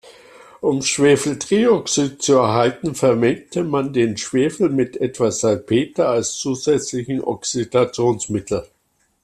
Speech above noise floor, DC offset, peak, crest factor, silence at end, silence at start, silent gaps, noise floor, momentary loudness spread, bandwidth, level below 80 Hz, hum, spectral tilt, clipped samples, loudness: 26 dB; under 0.1%; -4 dBFS; 16 dB; 0.6 s; 0.05 s; none; -45 dBFS; 8 LU; 13.5 kHz; -54 dBFS; none; -4.5 dB/octave; under 0.1%; -19 LUFS